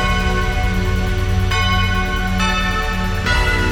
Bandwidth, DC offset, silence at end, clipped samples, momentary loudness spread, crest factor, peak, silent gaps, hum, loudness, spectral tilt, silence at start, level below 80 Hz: 18 kHz; under 0.1%; 0 s; under 0.1%; 4 LU; 12 dB; -4 dBFS; none; none; -18 LUFS; -5 dB/octave; 0 s; -20 dBFS